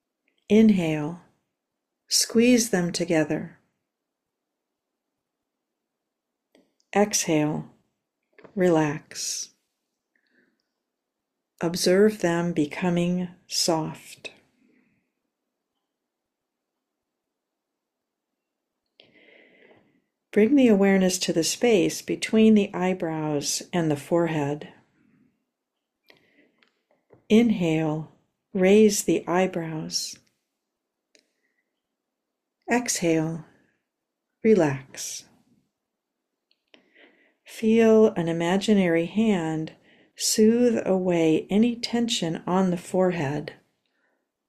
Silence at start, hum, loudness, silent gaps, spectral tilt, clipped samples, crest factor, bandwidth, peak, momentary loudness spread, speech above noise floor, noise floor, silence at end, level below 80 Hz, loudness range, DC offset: 0.5 s; none; -23 LUFS; none; -4.5 dB/octave; under 0.1%; 18 dB; 14 kHz; -8 dBFS; 15 LU; 62 dB; -84 dBFS; 0.95 s; -64 dBFS; 9 LU; under 0.1%